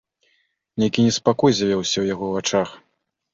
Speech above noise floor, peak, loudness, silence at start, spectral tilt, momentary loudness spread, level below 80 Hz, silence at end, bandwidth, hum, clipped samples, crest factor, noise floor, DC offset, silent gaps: 47 dB; -2 dBFS; -20 LUFS; 0.75 s; -4.5 dB/octave; 6 LU; -56 dBFS; 0.55 s; 7.6 kHz; none; under 0.1%; 18 dB; -67 dBFS; under 0.1%; none